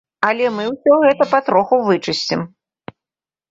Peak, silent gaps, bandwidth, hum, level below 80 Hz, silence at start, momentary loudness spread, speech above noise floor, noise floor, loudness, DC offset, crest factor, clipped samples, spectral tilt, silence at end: -2 dBFS; none; 7.8 kHz; none; -60 dBFS; 0.2 s; 8 LU; over 75 dB; under -90 dBFS; -16 LUFS; under 0.1%; 16 dB; under 0.1%; -5 dB/octave; 1.05 s